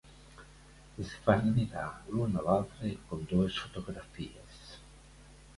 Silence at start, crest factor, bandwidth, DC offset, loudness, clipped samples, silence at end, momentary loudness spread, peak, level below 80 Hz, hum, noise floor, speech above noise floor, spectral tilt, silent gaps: 0.05 s; 24 dB; 11.5 kHz; under 0.1%; -33 LUFS; under 0.1%; 0.05 s; 23 LU; -10 dBFS; -52 dBFS; none; -55 dBFS; 23 dB; -7 dB/octave; none